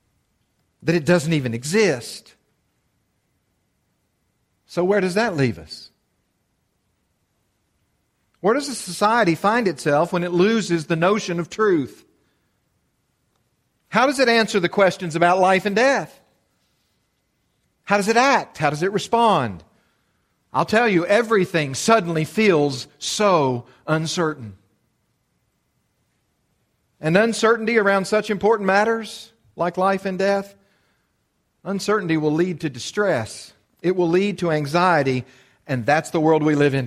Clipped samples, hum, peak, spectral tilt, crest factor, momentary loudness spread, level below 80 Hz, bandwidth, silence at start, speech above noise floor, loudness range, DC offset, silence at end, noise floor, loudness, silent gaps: under 0.1%; none; -2 dBFS; -5 dB/octave; 20 dB; 11 LU; -60 dBFS; 15 kHz; 0.85 s; 50 dB; 7 LU; under 0.1%; 0 s; -70 dBFS; -20 LUFS; none